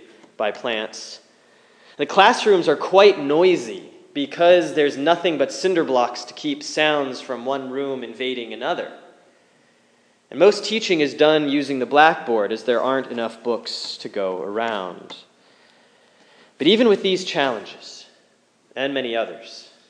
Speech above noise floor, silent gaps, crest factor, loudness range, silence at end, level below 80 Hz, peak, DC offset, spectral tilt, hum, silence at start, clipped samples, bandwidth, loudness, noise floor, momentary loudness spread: 40 dB; none; 20 dB; 8 LU; 0.3 s; -82 dBFS; 0 dBFS; under 0.1%; -4 dB/octave; none; 0.4 s; under 0.1%; 10.5 kHz; -20 LUFS; -60 dBFS; 18 LU